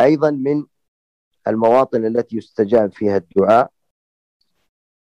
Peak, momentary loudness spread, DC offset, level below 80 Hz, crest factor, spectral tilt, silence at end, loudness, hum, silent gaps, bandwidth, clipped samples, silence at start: -4 dBFS; 9 LU; under 0.1%; -60 dBFS; 14 dB; -8 dB/octave; 1.45 s; -17 LUFS; none; 0.88-1.31 s; 9 kHz; under 0.1%; 0 s